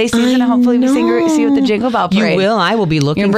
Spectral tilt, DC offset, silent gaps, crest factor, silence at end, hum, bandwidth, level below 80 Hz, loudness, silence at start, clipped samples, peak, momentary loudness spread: -6 dB/octave; under 0.1%; none; 12 dB; 0 s; none; 14 kHz; -46 dBFS; -12 LUFS; 0 s; under 0.1%; 0 dBFS; 2 LU